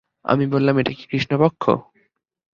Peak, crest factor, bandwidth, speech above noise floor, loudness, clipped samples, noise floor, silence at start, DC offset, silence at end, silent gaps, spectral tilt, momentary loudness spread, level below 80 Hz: -2 dBFS; 20 dB; 7.2 kHz; 46 dB; -20 LUFS; under 0.1%; -65 dBFS; 0.25 s; under 0.1%; 0.75 s; none; -8 dB/octave; 6 LU; -56 dBFS